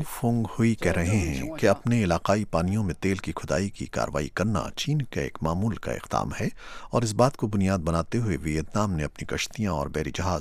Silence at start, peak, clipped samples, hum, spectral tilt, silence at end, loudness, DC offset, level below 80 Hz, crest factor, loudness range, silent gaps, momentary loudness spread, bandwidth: 0 s; -6 dBFS; under 0.1%; none; -6 dB/octave; 0 s; -27 LUFS; under 0.1%; -42 dBFS; 20 dB; 3 LU; none; 7 LU; 15.5 kHz